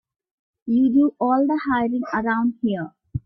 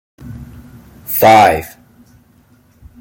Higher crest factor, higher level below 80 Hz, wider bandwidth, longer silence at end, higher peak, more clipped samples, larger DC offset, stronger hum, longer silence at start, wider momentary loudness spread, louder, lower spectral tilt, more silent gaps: about the same, 12 dB vs 16 dB; second, -52 dBFS vs -44 dBFS; second, 6 kHz vs 17 kHz; second, 0.05 s vs 1.35 s; second, -8 dBFS vs 0 dBFS; neither; neither; neither; first, 0.65 s vs 0.25 s; second, 9 LU vs 26 LU; second, -21 LUFS vs -10 LUFS; first, -9 dB/octave vs -4.5 dB/octave; neither